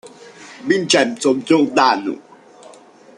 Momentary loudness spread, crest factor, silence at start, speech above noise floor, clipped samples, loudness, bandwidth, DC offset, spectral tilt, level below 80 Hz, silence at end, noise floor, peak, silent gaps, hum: 17 LU; 18 dB; 0.05 s; 28 dB; under 0.1%; -16 LUFS; 11 kHz; under 0.1%; -3.5 dB/octave; -66 dBFS; 0.5 s; -44 dBFS; 0 dBFS; none; none